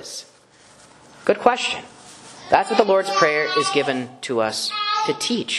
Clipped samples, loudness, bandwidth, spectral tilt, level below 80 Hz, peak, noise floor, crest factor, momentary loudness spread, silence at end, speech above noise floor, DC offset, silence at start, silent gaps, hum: under 0.1%; -20 LUFS; 12.5 kHz; -3 dB/octave; -64 dBFS; 0 dBFS; -51 dBFS; 22 dB; 15 LU; 0 s; 31 dB; under 0.1%; 0 s; none; none